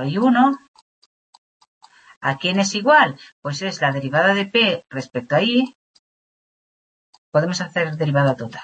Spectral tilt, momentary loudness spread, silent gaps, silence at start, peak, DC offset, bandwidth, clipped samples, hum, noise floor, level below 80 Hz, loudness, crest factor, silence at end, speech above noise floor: -5 dB/octave; 13 LU; 0.68-0.74 s, 0.82-1.60 s, 1.67-1.81 s, 2.17-2.21 s, 3.32-3.42 s, 5.75-7.32 s; 0 s; -2 dBFS; under 0.1%; 8.6 kHz; under 0.1%; none; under -90 dBFS; -66 dBFS; -19 LUFS; 20 dB; 0 s; over 71 dB